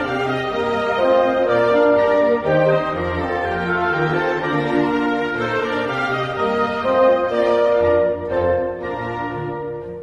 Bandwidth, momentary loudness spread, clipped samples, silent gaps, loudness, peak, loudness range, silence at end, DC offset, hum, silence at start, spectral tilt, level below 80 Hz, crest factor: 9.4 kHz; 9 LU; under 0.1%; none; -18 LUFS; -4 dBFS; 3 LU; 0 s; under 0.1%; none; 0 s; -7 dB/octave; -46 dBFS; 14 dB